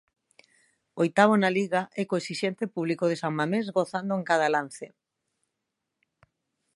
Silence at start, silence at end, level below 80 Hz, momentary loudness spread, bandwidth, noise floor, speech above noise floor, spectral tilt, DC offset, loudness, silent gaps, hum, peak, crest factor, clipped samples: 0.95 s; 1.9 s; -78 dBFS; 10 LU; 11.5 kHz; -83 dBFS; 58 dB; -5.5 dB/octave; under 0.1%; -26 LUFS; none; none; -6 dBFS; 22 dB; under 0.1%